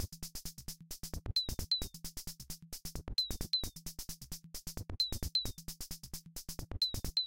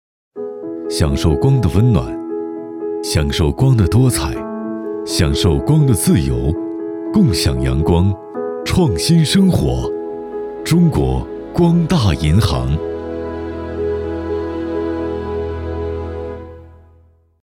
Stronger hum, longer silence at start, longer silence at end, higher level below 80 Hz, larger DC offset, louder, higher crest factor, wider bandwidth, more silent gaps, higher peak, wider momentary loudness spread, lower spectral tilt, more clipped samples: neither; second, 0 s vs 0.35 s; second, 0 s vs 0.7 s; second, -48 dBFS vs -30 dBFS; first, 0.1% vs under 0.1%; second, -39 LUFS vs -17 LUFS; about the same, 18 dB vs 14 dB; about the same, 17 kHz vs 17 kHz; neither; second, -22 dBFS vs -2 dBFS; about the same, 12 LU vs 12 LU; second, -2.5 dB/octave vs -6.5 dB/octave; neither